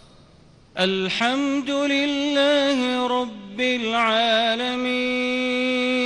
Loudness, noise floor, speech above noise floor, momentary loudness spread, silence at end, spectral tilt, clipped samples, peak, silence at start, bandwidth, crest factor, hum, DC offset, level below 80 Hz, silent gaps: -21 LUFS; -51 dBFS; 30 dB; 5 LU; 0 s; -3.5 dB/octave; under 0.1%; -8 dBFS; 0.75 s; 11 kHz; 14 dB; none; under 0.1%; -60 dBFS; none